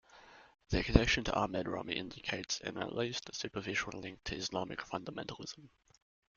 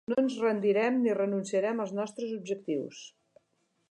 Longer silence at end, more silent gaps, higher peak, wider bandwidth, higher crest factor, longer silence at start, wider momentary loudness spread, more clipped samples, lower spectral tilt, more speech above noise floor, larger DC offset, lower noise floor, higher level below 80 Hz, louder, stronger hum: about the same, 0.7 s vs 0.8 s; neither; first, -6 dBFS vs -16 dBFS; second, 7.4 kHz vs 10.5 kHz; first, 30 dB vs 16 dB; about the same, 0.15 s vs 0.1 s; first, 14 LU vs 10 LU; neither; second, -4.5 dB/octave vs -6 dB/octave; second, 22 dB vs 46 dB; neither; second, -59 dBFS vs -75 dBFS; first, -48 dBFS vs -82 dBFS; second, -37 LUFS vs -30 LUFS; neither